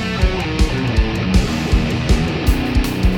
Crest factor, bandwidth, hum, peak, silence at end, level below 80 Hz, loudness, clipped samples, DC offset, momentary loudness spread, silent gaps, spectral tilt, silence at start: 14 dB; 19 kHz; none; -2 dBFS; 0 s; -20 dBFS; -18 LUFS; under 0.1%; under 0.1%; 2 LU; none; -6 dB/octave; 0 s